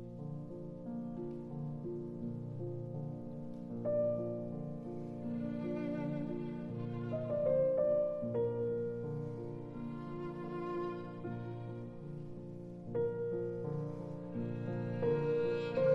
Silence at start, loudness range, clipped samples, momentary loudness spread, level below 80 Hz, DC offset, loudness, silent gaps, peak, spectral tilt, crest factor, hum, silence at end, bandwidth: 0 s; 7 LU; under 0.1%; 12 LU; -62 dBFS; under 0.1%; -39 LUFS; none; -20 dBFS; -10 dB/octave; 18 dB; none; 0 s; 7.4 kHz